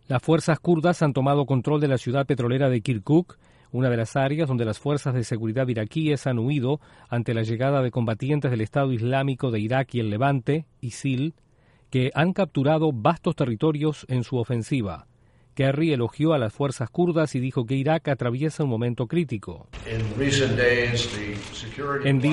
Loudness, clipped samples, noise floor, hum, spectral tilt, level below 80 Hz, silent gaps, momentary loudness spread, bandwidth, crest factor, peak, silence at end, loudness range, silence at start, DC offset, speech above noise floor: -24 LUFS; under 0.1%; -55 dBFS; none; -6.5 dB/octave; -52 dBFS; none; 8 LU; 11.5 kHz; 16 dB; -8 dBFS; 0 s; 2 LU; 0.1 s; under 0.1%; 31 dB